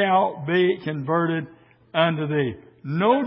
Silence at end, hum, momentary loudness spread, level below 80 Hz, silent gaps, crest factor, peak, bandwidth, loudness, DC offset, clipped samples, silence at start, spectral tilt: 0 s; none; 9 LU; -62 dBFS; none; 18 dB; -4 dBFS; 5.6 kHz; -23 LUFS; under 0.1%; under 0.1%; 0 s; -11 dB/octave